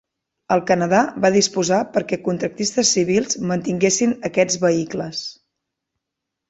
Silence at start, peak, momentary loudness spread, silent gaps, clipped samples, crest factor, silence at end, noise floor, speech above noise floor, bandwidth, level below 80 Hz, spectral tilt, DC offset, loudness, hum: 0.5 s; -2 dBFS; 7 LU; none; under 0.1%; 18 dB; 1.2 s; -82 dBFS; 63 dB; 8.2 kHz; -58 dBFS; -4 dB/octave; under 0.1%; -19 LUFS; none